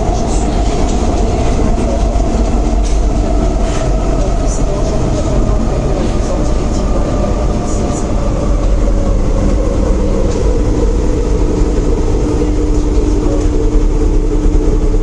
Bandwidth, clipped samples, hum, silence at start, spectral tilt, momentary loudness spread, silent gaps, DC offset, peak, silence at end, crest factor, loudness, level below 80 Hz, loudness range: 10 kHz; under 0.1%; none; 0 s; -7 dB/octave; 2 LU; none; under 0.1%; 0 dBFS; 0 s; 10 dB; -15 LUFS; -14 dBFS; 1 LU